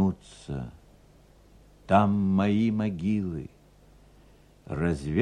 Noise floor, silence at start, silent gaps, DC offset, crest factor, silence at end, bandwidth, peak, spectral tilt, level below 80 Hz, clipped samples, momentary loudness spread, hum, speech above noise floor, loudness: -56 dBFS; 0 s; none; under 0.1%; 22 dB; 0 s; 10 kHz; -8 dBFS; -8 dB/octave; -50 dBFS; under 0.1%; 16 LU; 50 Hz at -50 dBFS; 30 dB; -27 LUFS